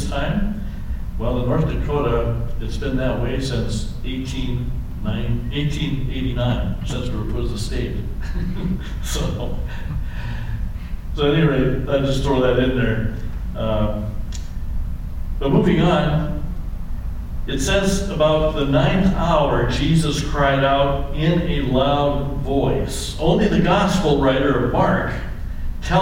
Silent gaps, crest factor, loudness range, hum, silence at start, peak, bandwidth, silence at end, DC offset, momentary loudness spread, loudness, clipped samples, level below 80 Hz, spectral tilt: none; 16 dB; 6 LU; none; 0 s; -2 dBFS; 16 kHz; 0 s; under 0.1%; 13 LU; -21 LUFS; under 0.1%; -26 dBFS; -6 dB/octave